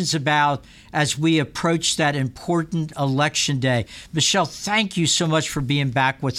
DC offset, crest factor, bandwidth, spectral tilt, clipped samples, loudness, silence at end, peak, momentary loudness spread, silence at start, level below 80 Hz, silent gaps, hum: under 0.1%; 16 dB; 15 kHz; -4 dB/octave; under 0.1%; -21 LUFS; 0 s; -6 dBFS; 6 LU; 0 s; -50 dBFS; none; none